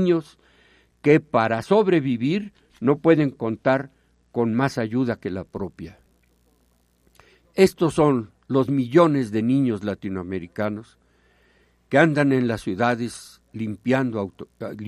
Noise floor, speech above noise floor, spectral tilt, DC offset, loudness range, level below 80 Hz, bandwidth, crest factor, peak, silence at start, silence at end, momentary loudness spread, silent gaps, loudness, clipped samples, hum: -63 dBFS; 42 dB; -7 dB/octave; under 0.1%; 5 LU; -58 dBFS; 13.5 kHz; 20 dB; -2 dBFS; 0 s; 0 s; 15 LU; none; -22 LUFS; under 0.1%; none